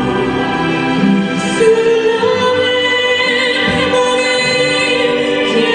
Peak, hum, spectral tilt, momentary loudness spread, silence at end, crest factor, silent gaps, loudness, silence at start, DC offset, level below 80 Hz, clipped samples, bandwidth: 0 dBFS; none; -4 dB/octave; 4 LU; 0 s; 12 dB; none; -12 LUFS; 0 s; under 0.1%; -42 dBFS; under 0.1%; 10.5 kHz